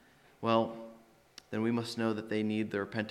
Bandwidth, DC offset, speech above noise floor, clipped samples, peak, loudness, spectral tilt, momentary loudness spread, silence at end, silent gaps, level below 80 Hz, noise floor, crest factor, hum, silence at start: 13 kHz; under 0.1%; 26 dB; under 0.1%; -14 dBFS; -34 LUFS; -6.5 dB/octave; 10 LU; 0 s; none; -76 dBFS; -58 dBFS; 20 dB; none; 0.4 s